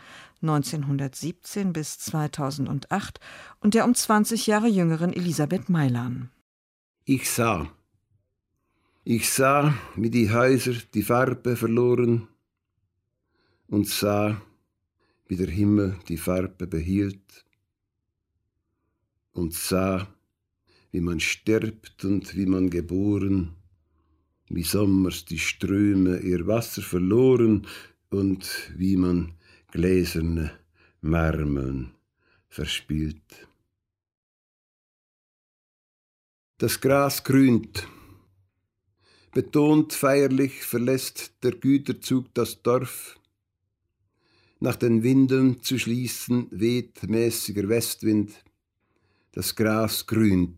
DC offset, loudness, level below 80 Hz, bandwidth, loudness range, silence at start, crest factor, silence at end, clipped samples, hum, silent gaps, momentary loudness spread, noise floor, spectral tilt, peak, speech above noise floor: under 0.1%; -24 LUFS; -48 dBFS; 16 kHz; 7 LU; 0.05 s; 18 dB; 0 s; under 0.1%; none; 6.41-6.94 s, 34.17-36.54 s; 13 LU; -81 dBFS; -5.5 dB/octave; -8 dBFS; 57 dB